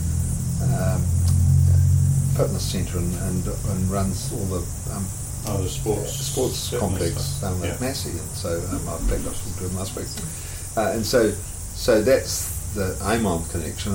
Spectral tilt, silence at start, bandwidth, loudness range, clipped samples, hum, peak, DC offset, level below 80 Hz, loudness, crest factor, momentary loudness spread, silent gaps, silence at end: -5.5 dB/octave; 0 s; 17 kHz; 6 LU; under 0.1%; none; -8 dBFS; under 0.1%; -34 dBFS; -24 LUFS; 16 dB; 10 LU; none; 0 s